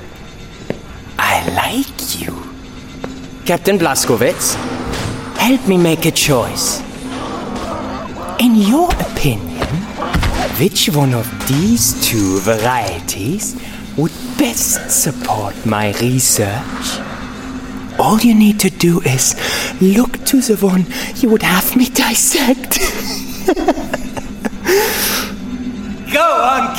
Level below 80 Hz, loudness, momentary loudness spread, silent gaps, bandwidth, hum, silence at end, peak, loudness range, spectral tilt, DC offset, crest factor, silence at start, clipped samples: -32 dBFS; -14 LUFS; 14 LU; none; 17 kHz; none; 0 s; 0 dBFS; 4 LU; -4 dB/octave; under 0.1%; 16 dB; 0 s; under 0.1%